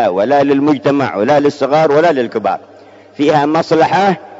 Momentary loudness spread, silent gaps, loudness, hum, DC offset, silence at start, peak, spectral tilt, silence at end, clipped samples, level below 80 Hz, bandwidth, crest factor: 6 LU; none; -12 LUFS; none; under 0.1%; 0 s; 0 dBFS; -6.5 dB/octave; 0 s; under 0.1%; -60 dBFS; 7.8 kHz; 12 dB